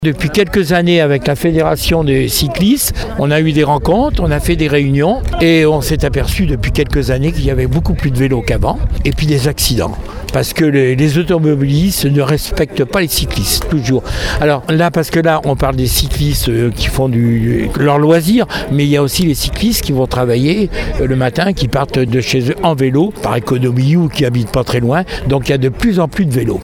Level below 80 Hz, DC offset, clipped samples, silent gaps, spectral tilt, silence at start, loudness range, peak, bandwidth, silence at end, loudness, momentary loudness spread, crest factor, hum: -24 dBFS; under 0.1%; under 0.1%; none; -5.5 dB/octave; 0 s; 2 LU; 0 dBFS; 17.5 kHz; 0 s; -13 LUFS; 4 LU; 12 dB; none